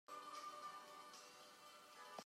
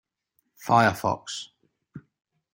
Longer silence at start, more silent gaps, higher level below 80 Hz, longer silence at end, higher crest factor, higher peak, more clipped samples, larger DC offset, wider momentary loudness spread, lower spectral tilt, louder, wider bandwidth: second, 0.1 s vs 0.6 s; neither; second, under -90 dBFS vs -66 dBFS; second, 0 s vs 0.55 s; about the same, 20 dB vs 22 dB; second, -38 dBFS vs -6 dBFS; neither; neither; second, 8 LU vs 18 LU; second, -1 dB/octave vs -5 dB/octave; second, -56 LUFS vs -24 LUFS; about the same, 16 kHz vs 16.5 kHz